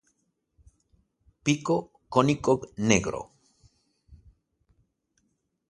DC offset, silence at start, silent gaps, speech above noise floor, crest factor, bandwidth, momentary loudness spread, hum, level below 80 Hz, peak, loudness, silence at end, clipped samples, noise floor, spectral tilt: under 0.1%; 1.45 s; none; 50 dB; 26 dB; 11.5 kHz; 11 LU; none; -56 dBFS; -4 dBFS; -26 LUFS; 1.55 s; under 0.1%; -75 dBFS; -5 dB/octave